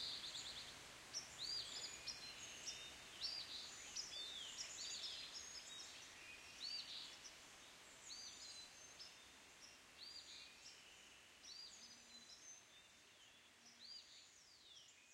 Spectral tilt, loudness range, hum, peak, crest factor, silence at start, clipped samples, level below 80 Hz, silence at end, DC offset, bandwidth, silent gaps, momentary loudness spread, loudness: 0.5 dB/octave; 10 LU; none; -34 dBFS; 20 dB; 0 s; under 0.1%; -82 dBFS; 0 s; under 0.1%; 16 kHz; none; 15 LU; -52 LUFS